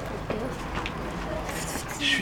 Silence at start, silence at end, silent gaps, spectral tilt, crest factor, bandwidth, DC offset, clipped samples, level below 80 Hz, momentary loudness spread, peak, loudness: 0 s; 0 s; none; -3.5 dB/octave; 18 dB; over 20 kHz; under 0.1%; under 0.1%; -42 dBFS; 6 LU; -12 dBFS; -31 LUFS